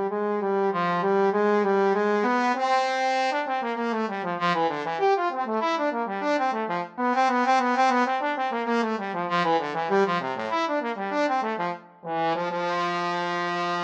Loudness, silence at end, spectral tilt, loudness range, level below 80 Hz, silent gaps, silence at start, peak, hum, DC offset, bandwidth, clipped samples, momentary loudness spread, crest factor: -25 LUFS; 0 s; -5 dB/octave; 3 LU; -84 dBFS; none; 0 s; -10 dBFS; none; under 0.1%; 8.8 kHz; under 0.1%; 6 LU; 16 dB